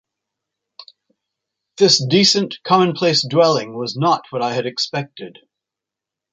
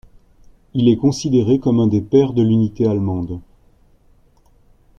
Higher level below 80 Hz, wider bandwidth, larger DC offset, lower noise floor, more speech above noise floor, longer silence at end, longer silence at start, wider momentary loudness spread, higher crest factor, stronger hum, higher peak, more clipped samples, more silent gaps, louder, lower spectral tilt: second, -64 dBFS vs -46 dBFS; about the same, 9.4 kHz vs 9.2 kHz; neither; first, -86 dBFS vs -53 dBFS; first, 69 dB vs 37 dB; second, 1 s vs 1.6 s; about the same, 0.8 s vs 0.75 s; first, 13 LU vs 10 LU; about the same, 18 dB vs 16 dB; neither; about the same, -2 dBFS vs -2 dBFS; neither; neither; about the same, -16 LUFS vs -17 LUFS; second, -4 dB/octave vs -8 dB/octave